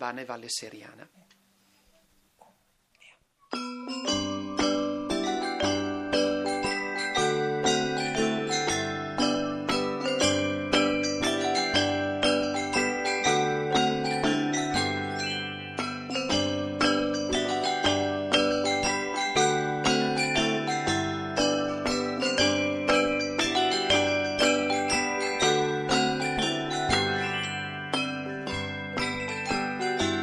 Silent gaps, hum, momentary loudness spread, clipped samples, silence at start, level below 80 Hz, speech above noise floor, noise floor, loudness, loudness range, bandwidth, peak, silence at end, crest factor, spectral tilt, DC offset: none; none; 7 LU; under 0.1%; 0 s; -54 dBFS; 30 dB; -67 dBFS; -27 LUFS; 6 LU; 12.5 kHz; -10 dBFS; 0 s; 18 dB; -3.5 dB/octave; under 0.1%